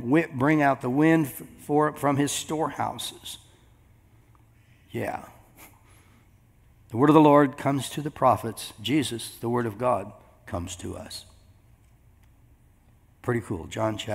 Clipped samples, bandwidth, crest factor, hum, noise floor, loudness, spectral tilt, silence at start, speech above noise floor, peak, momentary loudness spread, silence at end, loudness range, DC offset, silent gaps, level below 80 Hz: under 0.1%; 16 kHz; 24 dB; none; -58 dBFS; -25 LUFS; -5.5 dB/octave; 0 s; 34 dB; -2 dBFS; 18 LU; 0 s; 17 LU; under 0.1%; none; -60 dBFS